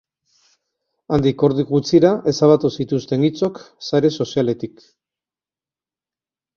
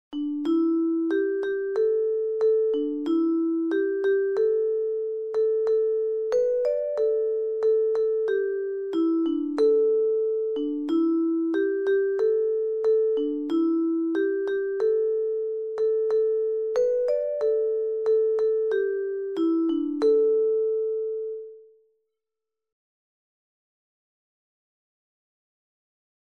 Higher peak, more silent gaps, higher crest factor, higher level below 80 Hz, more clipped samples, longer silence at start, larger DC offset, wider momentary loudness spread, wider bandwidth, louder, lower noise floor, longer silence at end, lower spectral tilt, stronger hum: first, -2 dBFS vs -12 dBFS; neither; first, 18 dB vs 12 dB; first, -52 dBFS vs -72 dBFS; neither; first, 1.1 s vs 0.1 s; neither; first, 9 LU vs 5 LU; about the same, 7.2 kHz vs 6.8 kHz; first, -18 LUFS vs -25 LUFS; about the same, under -90 dBFS vs -88 dBFS; second, 1.9 s vs 4.6 s; first, -7 dB/octave vs -5.5 dB/octave; neither